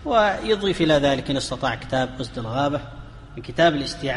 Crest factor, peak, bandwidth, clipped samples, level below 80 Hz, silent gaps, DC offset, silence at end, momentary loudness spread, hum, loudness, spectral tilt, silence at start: 16 dB; -6 dBFS; 11.5 kHz; under 0.1%; -42 dBFS; none; under 0.1%; 0 s; 14 LU; none; -22 LUFS; -5 dB/octave; 0 s